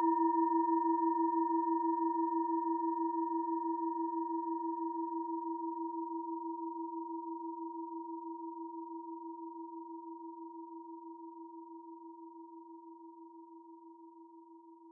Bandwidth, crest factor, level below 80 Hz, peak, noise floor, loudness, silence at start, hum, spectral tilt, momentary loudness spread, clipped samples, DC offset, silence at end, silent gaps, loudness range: 1.9 kHz; 16 dB; under -90 dBFS; -22 dBFS; -57 dBFS; -37 LUFS; 0 s; none; 1 dB/octave; 22 LU; under 0.1%; under 0.1%; 0 s; none; 18 LU